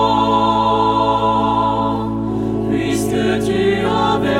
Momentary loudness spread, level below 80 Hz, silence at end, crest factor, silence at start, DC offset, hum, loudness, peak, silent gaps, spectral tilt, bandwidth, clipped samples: 5 LU; -36 dBFS; 0 s; 12 dB; 0 s; under 0.1%; none; -16 LUFS; -4 dBFS; none; -6 dB/octave; 16 kHz; under 0.1%